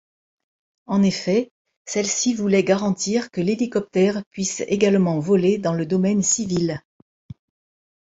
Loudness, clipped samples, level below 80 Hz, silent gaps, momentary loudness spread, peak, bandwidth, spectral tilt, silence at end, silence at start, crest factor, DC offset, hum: -21 LUFS; under 0.1%; -58 dBFS; 1.51-1.65 s, 1.77-1.85 s, 4.26-4.31 s; 7 LU; -4 dBFS; 8 kHz; -5 dB/octave; 1.25 s; 0.9 s; 18 dB; under 0.1%; none